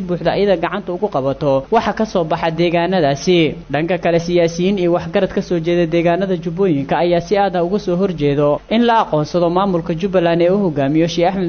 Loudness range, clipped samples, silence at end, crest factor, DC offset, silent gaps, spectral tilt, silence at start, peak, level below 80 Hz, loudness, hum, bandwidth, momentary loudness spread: 1 LU; under 0.1%; 0 s; 12 dB; under 0.1%; none; -6.5 dB/octave; 0 s; -4 dBFS; -42 dBFS; -16 LUFS; none; 6.8 kHz; 4 LU